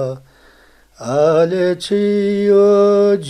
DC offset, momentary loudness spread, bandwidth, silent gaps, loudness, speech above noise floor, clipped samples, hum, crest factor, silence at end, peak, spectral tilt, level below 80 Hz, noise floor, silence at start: under 0.1%; 13 LU; 10.5 kHz; none; -14 LUFS; 35 dB; under 0.1%; none; 12 dB; 0 s; -2 dBFS; -6.5 dB/octave; -54 dBFS; -49 dBFS; 0 s